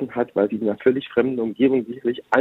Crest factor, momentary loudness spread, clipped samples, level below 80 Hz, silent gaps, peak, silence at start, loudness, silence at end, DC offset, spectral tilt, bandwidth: 20 dB; 4 LU; under 0.1%; -62 dBFS; none; 0 dBFS; 0 s; -22 LUFS; 0 s; under 0.1%; -8 dB/octave; 6.8 kHz